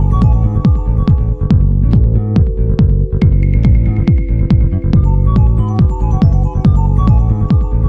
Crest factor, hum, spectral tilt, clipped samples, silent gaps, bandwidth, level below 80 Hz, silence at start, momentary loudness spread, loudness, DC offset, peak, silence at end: 10 dB; none; -10.5 dB/octave; under 0.1%; none; 5.2 kHz; -14 dBFS; 0 s; 2 LU; -12 LUFS; under 0.1%; 0 dBFS; 0 s